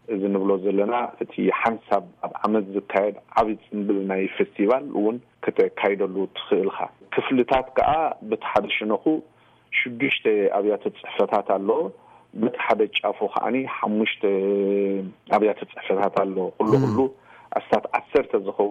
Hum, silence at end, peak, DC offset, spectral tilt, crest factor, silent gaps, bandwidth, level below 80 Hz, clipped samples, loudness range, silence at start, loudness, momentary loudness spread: none; 0 s; -8 dBFS; under 0.1%; -7.5 dB/octave; 16 dB; none; 7.4 kHz; -58 dBFS; under 0.1%; 1 LU; 0.1 s; -23 LUFS; 6 LU